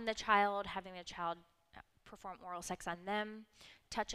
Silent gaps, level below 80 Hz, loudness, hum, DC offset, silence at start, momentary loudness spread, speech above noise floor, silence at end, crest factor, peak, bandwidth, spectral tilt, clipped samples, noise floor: none; -66 dBFS; -39 LUFS; none; under 0.1%; 0 s; 25 LU; 22 dB; 0 s; 24 dB; -16 dBFS; 15 kHz; -3 dB/octave; under 0.1%; -62 dBFS